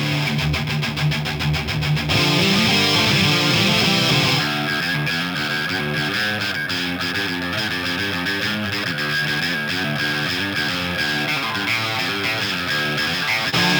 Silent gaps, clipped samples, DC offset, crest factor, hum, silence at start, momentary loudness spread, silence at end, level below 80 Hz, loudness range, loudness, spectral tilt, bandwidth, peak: none; under 0.1%; under 0.1%; 16 dB; none; 0 s; 6 LU; 0 s; -44 dBFS; 5 LU; -19 LUFS; -4 dB/octave; over 20 kHz; -4 dBFS